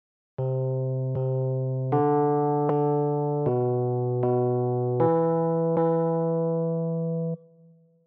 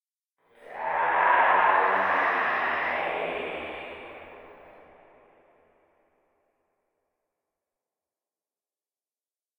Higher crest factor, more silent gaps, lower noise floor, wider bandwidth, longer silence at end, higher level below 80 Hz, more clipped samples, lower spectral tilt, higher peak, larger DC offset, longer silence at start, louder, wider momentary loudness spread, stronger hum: second, 16 dB vs 22 dB; neither; second, -56 dBFS vs under -90 dBFS; second, 3.1 kHz vs 19 kHz; second, 0.7 s vs 4.9 s; about the same, -68 dBFS vs -68 dBFS; neither; first, -11.5 dB/octave vs -5 dB/octave; about the same, -10 dBFS vs -8 dBFS; neither; second, 0.4 s vs 0.65 s; about the same, -25 LUFS vs -24 LUFS; second, 5 LU vs 22 LU; neither